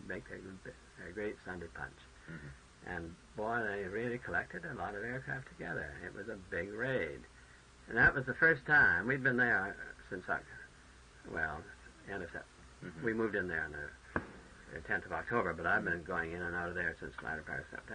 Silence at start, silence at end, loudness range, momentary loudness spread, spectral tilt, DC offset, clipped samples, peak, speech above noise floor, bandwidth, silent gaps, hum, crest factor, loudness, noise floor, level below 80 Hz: 0 s; 0 s; 12 LU; 22 LU; -6 dB/octave; under 0.1%; under 0.1%; -16 dBFS; 22 dB; 10 kHz; none; none; 22 dB; -36 LUFS; -59 dBFS; -60 dBFS